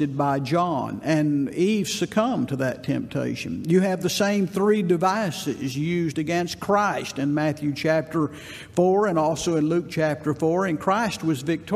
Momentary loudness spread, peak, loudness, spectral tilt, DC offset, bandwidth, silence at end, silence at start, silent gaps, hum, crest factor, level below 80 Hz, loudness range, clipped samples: 6 LU; -6 dBFS; -23 LUFS; -6 dB/octave; under 0.1%; 15.5 kHz; 0 s; 0 s; none; none; 18 dB; -58 dBFS; 1 LU; under 0.1%